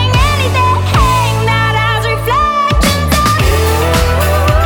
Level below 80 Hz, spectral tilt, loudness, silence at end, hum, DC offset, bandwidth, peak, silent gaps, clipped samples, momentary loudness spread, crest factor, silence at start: -18 dBFS; -4.5 dB/octave; -11 LUFS; 0 s; none; under 0.1%; 20 kHz; 0 dBFS; none; under 0.1%; 1 LU; 10 dB; 0 s